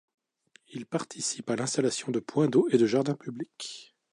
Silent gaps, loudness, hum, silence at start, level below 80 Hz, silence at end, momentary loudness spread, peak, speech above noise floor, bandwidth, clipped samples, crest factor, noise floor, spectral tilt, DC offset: none; -28 LUFS; none; 0.7 s; -76 dBFS; 0.3 s; 16 LU; -10 dBFS; 36 dB; 11.5 kHz; under 0.1%; 20 dB; -64 dBFS; -5 dB/octave; under 0.1%